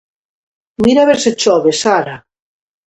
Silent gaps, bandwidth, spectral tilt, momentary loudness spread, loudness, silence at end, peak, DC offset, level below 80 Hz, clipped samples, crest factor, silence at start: none; 11 kHz; -3.5 dB/octave; 10 LU; -12 LUFS; 0.7 s; 0 dBFS; under 0.1%; -50 dBFS; under 0.1%; 14 dB; 0.8 s